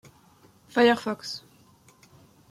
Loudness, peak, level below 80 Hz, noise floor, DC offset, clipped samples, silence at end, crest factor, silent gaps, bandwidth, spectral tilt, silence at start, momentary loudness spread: -25 LUFS; -8 dBFS; -72 dBFS; -58 dBFS; under 0.1%; under 0.1%; 1.1 s; 20 dB; none; 14.5 kHz; -4 dB/octave; 0.75 s; 16 LU